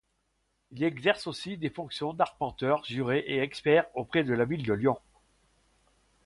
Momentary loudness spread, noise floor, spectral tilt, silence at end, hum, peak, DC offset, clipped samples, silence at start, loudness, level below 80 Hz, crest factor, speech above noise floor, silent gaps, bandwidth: 10 LU; -76 dBFS; -6.5 dB/octave; 1.3 s; none; -10 dBFS; under 0.1%; under 0.1%; 0.7 s; -29 LUFS; -62 dBFS; 20 dB; 47 dB; none; 11.5 kHz